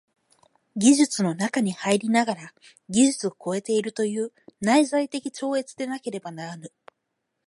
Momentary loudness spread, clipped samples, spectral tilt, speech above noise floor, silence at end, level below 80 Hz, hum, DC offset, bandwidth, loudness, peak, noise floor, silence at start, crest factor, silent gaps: 14 LU; under 0.1%; -4 dB/octave; 55 dB; 0.8 s; -70 dBFS; none; under 0.1%; 11.5 kHz; -24 LUFS; -6 dBFS; -79 dBFS; 0.75 s; 20 dB; none